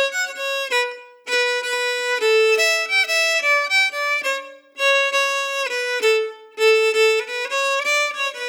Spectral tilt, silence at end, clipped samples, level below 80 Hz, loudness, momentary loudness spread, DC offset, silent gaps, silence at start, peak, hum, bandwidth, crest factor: 3.5 dB/octave; 0 s; under 0.1%; under -90 dBFS; -18 LUFS; 8 LU; under 0.1%; none; 0 s; -6 dBFS; none; 20 kHz; 14 dB